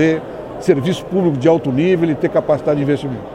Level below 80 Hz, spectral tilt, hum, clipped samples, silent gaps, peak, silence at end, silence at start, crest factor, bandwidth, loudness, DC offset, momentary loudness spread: -46 dBFS; -7.5 dB/octave; none; under 0.1%; none; 0 dBFS; 0 s; 0 s; 16 dB; 12 kHz; -16 LUFS; under 0.1%; 6 LU